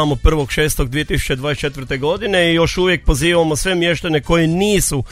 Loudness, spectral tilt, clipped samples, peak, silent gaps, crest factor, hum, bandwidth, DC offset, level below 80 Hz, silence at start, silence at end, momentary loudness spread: -16 LUFS; -4.5 dB/octave; under 0.1%; 0 dBFS; none; 16 dB; none; 16 kHz; under 0.1%; -24 dBFS; 0 s; 0 s; 5 LU